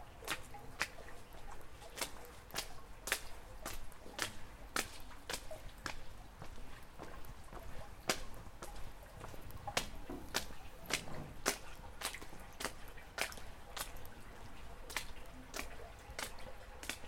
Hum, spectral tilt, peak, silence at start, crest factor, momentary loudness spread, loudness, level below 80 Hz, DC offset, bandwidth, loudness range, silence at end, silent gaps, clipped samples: none; -2 dB/octave; -14 dBFS; 0 s; 30 dB; 14 LU; -45 LUFS; -54 dBFS; under 0.1%; 16.5 kHz; 5 LU; 0 s; none; under 0.1%